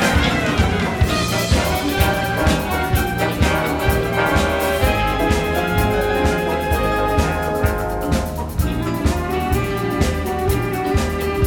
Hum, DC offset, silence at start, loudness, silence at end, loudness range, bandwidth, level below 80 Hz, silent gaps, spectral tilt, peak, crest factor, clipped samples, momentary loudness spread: none; under 0.1%; 0 s; -19 LUFS; 0 s; 3 LU; 19 kHz; -26 dBFS; none; -5.5 dB/octave; -2 dBFS; 16 dB; under 0.1%; 4 LU